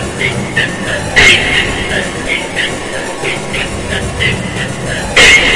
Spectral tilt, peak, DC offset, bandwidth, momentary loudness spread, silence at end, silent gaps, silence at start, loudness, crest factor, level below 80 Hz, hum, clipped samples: -2.5 dB/octave; 0 dBFS; under 0.1%; 12 kHz; 12 LU; 0 s; none; 0 s; -11 LUFS; 12 dB; -28 dBFS; none; 0.7%